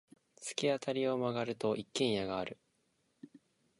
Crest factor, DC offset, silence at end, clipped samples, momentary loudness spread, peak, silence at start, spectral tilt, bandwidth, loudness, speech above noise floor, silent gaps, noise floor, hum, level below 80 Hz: 20 dB; under 0.1%; 0.45 s; under 0.1%; 10 LU; -18 dBFS; 0.4 s; -4.5 dB/octave; 11.5 kHz; -36 LUFS; 42 dB; none; -77 dBFS; none; -72 dBFS